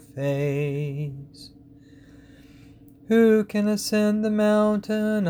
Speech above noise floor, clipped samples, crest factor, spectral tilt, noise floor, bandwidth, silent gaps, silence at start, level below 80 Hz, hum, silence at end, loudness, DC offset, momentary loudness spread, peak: 27 dB; under 0.1%; 16 dB; -6.5 dB/octave; -49 dBFS; over 20 kHz; none; 0.15 s; -58 dBFS; none; 0 s; -23 LUFS; under 0.1%; 13 LU; -8 dBFS